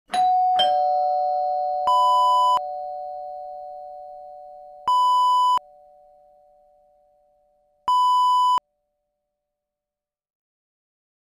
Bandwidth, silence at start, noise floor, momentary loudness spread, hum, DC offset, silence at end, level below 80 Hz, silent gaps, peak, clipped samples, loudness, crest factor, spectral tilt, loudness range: 15.5 kHz; 0.1 s; -90 dBFS; 20 LU; none; under 0.1%; 2.7 s; -68 dBFS; none; -8 dBFS; under 0.1%; -20 LUFS; 14 dB; -1 dB/octave; 3 LU